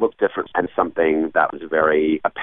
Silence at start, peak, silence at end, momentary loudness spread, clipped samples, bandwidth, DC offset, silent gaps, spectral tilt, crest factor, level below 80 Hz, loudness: 0 s; -4 dBFS; 0 s; 5 LU; under 0.1%; 3.9 kHz; 0.3%; none; -10 dB/octave; 16 dB; -56 dBFS; -20 LUFS